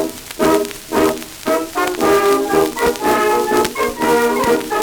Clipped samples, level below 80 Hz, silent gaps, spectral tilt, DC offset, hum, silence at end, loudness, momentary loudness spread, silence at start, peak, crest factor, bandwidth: under 0.1%; -44 dBFS; none; -3.5 dB/octave; under 0.1%; none; 0 s; -16 LUFS; 6 LU; 0 s; 0 dBFS; 16 dB; over 20 kHz